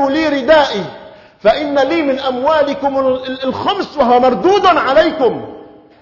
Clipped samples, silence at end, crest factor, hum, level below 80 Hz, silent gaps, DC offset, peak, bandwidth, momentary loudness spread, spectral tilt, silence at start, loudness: under 0.1%; 0.35 s; 14 dB; none; -46 dBFS; none; under 0.1%; 0 dBFS; 6 kHz; 8 LU; -5 dB/octave; 0 s; -13 LUFS